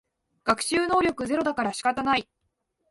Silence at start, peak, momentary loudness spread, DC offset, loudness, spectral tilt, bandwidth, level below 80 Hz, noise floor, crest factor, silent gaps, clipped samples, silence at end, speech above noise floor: 0.45 s; -8 dBFS; 4 LU; under 0.1%; -25 LUFS; -3.5 dB/octave; 12 kHz; -56 dBFS; -77 dBFS; 18 dB; none; under 0.1%; 0.7 s; 52 dB